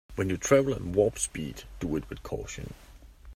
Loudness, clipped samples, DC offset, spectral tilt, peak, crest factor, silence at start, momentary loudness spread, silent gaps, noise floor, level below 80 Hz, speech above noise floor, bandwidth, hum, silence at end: -29 LUFS; under 0.1%; under 0.1%; -5 dB/octave; -8 dBFS; 22 dB; 0.1 s; 15 LU; none; -49 dBFS; -46 dBFS; 20 dB; 16 kHz; none; 0 s